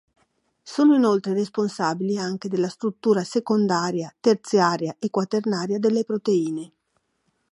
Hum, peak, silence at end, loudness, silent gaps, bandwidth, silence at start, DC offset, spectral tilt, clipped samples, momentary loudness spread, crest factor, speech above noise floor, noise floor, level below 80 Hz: none; -4 dBFS; 0.85 s; -23 LUFS; none; 11.5 kHz; 0.65 s; under 0.1%; -6 dB/octave; under 0.1%; 8 LU; 18 dB; 50 dB; -72 dBFS; -74 dBFS